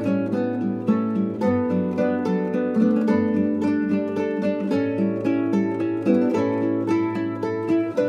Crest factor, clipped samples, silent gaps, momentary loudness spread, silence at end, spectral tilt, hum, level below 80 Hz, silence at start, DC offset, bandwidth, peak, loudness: 14 dB; under 0.1%; none; 4 LU; 0 s; -8.5 dB/octave; none; -70 dBFS; 0 s; under 0.1%; 8.8 kHz; -6 dBFS; -22 LUFS